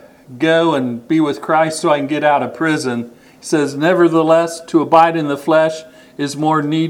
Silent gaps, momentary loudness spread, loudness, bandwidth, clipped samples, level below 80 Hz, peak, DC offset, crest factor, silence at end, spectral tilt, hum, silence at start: none; 10 LU; -15 LUFS; 14.5 kHz; under 0.1%; -62 dBFS; 0 dBFS; under 0.1%; 16 dB; 0 s; -5.5 dB/octave; none; 0.3 s